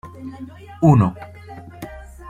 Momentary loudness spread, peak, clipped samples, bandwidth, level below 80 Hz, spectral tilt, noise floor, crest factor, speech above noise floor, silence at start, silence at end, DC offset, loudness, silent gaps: 23 LU; -2 dBFS; under 0.1%; 14.5 kHz; -44 dBFS; -9.5 dB/octave; -38 dBFS; 18 dB; 20 dB; 0.05 s; 0 s; under 0.1%; -16 LUFS; none